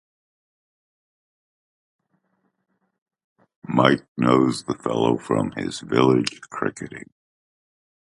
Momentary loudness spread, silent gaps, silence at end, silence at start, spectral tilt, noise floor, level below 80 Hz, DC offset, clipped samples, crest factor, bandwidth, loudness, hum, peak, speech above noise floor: 11 LU; 4.08-4.15 s; 1.1 s; 3.7 s; -6 dB/octave; -71 dBFS; -60 dBFS; under 0.1%; under 0.1%; 24 dB; 11.5 kHz; -22 LUFS; none; 0 dBFS; 50 dB